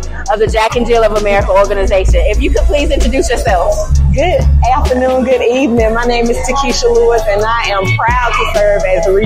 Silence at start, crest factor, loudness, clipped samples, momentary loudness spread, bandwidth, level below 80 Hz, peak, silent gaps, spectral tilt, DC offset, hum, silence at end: 0 s; 10 dB; -11 LUFS; under 0.1%; 2 LU; 15 kHz; -16 dBFS; 0 dBFS; none; -5.5 dB/octave; under 0.1%; none; 0 s